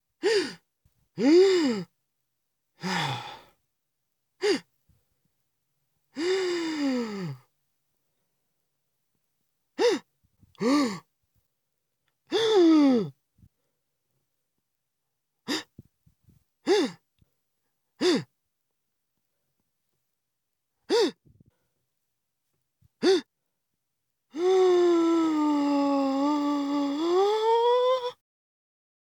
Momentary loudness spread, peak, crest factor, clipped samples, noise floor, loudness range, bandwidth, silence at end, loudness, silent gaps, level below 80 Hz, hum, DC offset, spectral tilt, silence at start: 16 LU; -10 dBFS; 18 dB; under 0.1%; -83 dBFS; 10 LU; 18.5 kHz; 1.1 s; -25 LUFS; none; -80 dBFS; none; under 0.1%; -5 dB/octave; 0.25 s